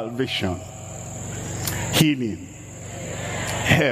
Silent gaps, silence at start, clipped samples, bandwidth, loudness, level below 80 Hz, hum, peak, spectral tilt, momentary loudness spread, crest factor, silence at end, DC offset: none; 0 s; under 0.1%; 15.5 kHz; -24 LUFS; -46 dBFS; none; -2 dBFS; -4 dB/octave; 16 LU; 22 dB; 0 s; under 0.1%